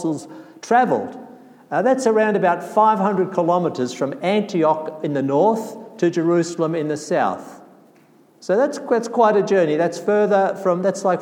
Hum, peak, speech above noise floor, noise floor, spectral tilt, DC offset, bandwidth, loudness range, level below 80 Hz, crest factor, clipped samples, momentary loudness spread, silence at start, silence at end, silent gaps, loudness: none; -4 dBFS; 34 dB; -52 dBFS; -6 dB/octave; under 0.1%; 16 kHz; 3 LU; -76 dBFS; 16 dB; under 0.1%; 9 LU; 0 s; 0 s; none; -19 LUFS